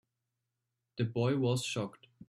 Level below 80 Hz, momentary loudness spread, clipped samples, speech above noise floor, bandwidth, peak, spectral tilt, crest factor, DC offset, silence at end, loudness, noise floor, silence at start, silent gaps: -70 dBFS; 12 LU; under 0.1%; 54 dB; 13 kHz; -18 dBFS; -6 dB/octave; 18 dB; under 0.1%; 0.05 s; -34 LUFS; -87 dBFS; 0.95 s; none